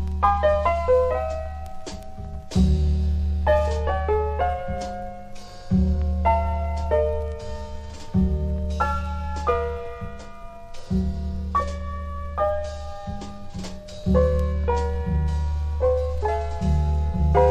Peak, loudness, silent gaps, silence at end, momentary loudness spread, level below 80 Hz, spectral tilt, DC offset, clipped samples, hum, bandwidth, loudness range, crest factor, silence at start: -6 dBFS; -24 LUFS; none; 0 s; 16 LU; -26 dBFS; -8 dB/octave; under 0.1%; under 0.1%; none; 8.8 kHz; 5 LU; 18 dB; 0 s